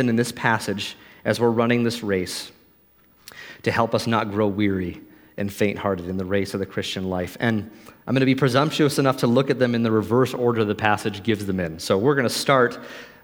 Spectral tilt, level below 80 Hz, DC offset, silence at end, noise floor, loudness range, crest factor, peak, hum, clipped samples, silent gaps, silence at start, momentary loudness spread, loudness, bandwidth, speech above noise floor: -5.5 dB/octave; -58 dBFS; under 0.1%; 0.1 s; -57 dBFS; 5 LU; 20 dB; -2 dBFS; none; under 0.1%; none; 0 s; 12 LU; -22 LUFS; 19 kHz; 35 dB